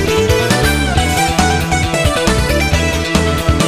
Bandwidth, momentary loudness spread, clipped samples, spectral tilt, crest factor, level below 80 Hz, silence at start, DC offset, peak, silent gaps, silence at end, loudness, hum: 15.5 kHz; 2 LU; under 0.1%; -4.5 dB/octave; 14 dB; -22 dBFS; 0 s; under 0.1%; 0 dBFS; none; 0 s; -13 LUFS; none